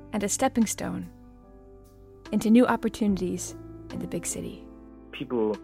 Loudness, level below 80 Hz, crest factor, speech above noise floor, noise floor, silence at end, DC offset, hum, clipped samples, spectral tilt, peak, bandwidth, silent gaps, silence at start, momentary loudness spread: -27 LUFS; -52 dBFS; 20 dB; 24 dB; -50 dBFS; 0 s; under 0.1%; none; under 0.1%; -5 dB/octave; -8 dBFS; 16 kHz; none; 0 s; 22 LU